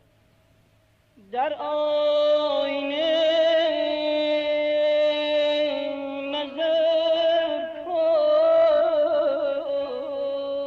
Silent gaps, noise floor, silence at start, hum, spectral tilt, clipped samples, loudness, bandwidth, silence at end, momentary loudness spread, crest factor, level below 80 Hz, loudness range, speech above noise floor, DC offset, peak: none; -61 dBFS; 1.3 s; none; -4 dB/octave; under 0.1%; -23 LUFS; 6.6 kHz; 0 s; 9 LU; 10 dB; -66 dBFS; 2 LU; 38 dB; under 0.1%; -12 dBFS